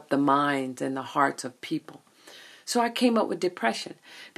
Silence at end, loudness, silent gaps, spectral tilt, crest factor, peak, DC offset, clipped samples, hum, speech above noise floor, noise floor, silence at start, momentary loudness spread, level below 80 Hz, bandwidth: 0.1 s; -27 LUFS; none; -4 dB/octave; 20 dB; -8 dBFS; under 0.1%; under 0.1%; none; 24 dB; -51 dBFS; 0.1 s; 17 LU; -80 dBFS; 14 kHz